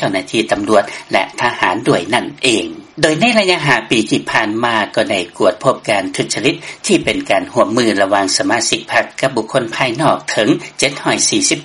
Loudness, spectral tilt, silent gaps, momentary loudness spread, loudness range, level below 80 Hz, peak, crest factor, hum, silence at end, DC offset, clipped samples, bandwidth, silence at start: -14 LUFS; -3 dB/octave; none; 5 LU; 1 LU; -50 dBFS; 0 dBFS; 14 dB; none; 0 s; under 0.1%; under 0.1%; 12 kHz; 0 s